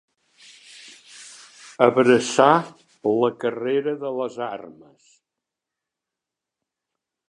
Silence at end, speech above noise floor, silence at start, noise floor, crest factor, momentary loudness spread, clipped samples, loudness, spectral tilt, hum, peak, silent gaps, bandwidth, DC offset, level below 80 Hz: 2.6 s; 66 dB; 0.85 s; -86 dBFS; 22 dB; 26 LU; under 0.1%; -21 LUFS; -5 dB/octave; none; -2 dBFS; none; 11 kHz; under 0.1%; -74 dBFS